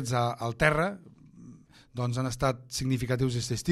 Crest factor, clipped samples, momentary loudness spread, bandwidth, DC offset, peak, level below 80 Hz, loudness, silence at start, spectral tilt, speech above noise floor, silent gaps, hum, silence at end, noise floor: 22 dB; under 0.1%; 8 LU; 14.5 kHz; under 0.1%; -8 dBFS; -50 dBFS; -29 LUFS; 0 s; -5.5 dB/octave; 24 dB; none; none; 0 s; -52 dBFS